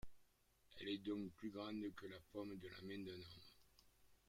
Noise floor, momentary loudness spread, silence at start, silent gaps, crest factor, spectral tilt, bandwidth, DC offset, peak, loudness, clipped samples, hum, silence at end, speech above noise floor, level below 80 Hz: -76 dBFS; 15 LU; 0.05 s; none; 16 dB; -6 dB/octave; 16.5 kHz; under 0.1%; -36 dBFS; -51 LUFS; under 0.1%; none; 0.1 s; 25 dB; -74 dBFS